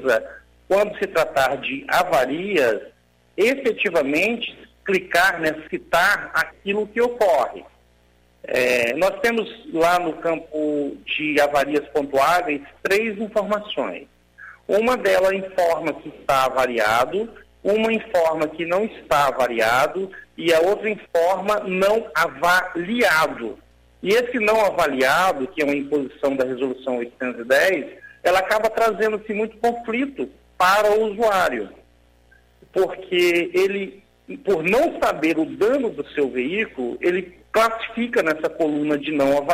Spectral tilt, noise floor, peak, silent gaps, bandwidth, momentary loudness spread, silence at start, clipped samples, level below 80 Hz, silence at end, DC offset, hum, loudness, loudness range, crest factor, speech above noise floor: -4 dB/octave; -57 dBFS; -6 dBFS; none; 16 kHz; 9 LU; 0 s; under 0.1%; -54 dBFS; 0 s; under 0.1%; none; -21 LUFS; 2 LU; 14 dB; 37 dB